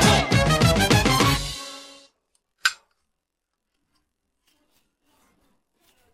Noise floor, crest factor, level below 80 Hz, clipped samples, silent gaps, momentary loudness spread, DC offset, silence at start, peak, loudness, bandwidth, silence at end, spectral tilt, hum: -81 dBFS; 18 dB; -38 dBFS; under 0.1%; none; 17 LU; under 0.1%; 0 s; -6 dBFS; -20 LUFS; 15.5 kHz; 3.4 s; -4 dB/octave; none